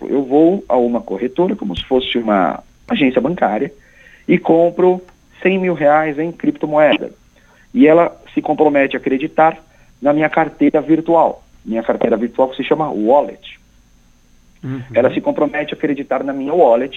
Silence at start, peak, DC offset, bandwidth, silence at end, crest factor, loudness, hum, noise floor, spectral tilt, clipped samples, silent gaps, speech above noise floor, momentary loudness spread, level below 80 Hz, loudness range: 0 s; 0 dBFS; under 0.1%; 6.8 kHz; 0 s; 16 dB; -15 LUFS; none; -50 dBFS; -8 dB/octave; under 0.1%; none; 35 dB; 10 LU; -48 dBFS; 4 LU